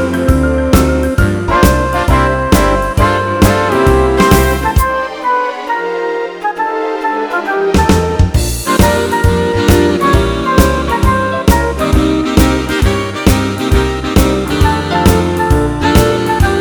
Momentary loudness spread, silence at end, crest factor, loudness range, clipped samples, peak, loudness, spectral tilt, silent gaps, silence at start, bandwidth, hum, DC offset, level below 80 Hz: 6 LU; 0 s; 12 dB; 3 LU; 0.4%; 0 dBFS; -12 LUFS; -5.5 dB/octave; none; 0 s; over 20 kHz; none; 0.2%; -18 dBFS